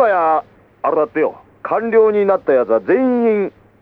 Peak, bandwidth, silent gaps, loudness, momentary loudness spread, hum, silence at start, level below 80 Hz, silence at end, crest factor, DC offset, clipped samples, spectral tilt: -2 dBFS; 4.4 kHz; none; -16 LUFS; 8 LU; none; 0 s; -60 dBFS; 0.3 s; 14 dB; under 0.1%; under 0.1%; -9.5 dB/octave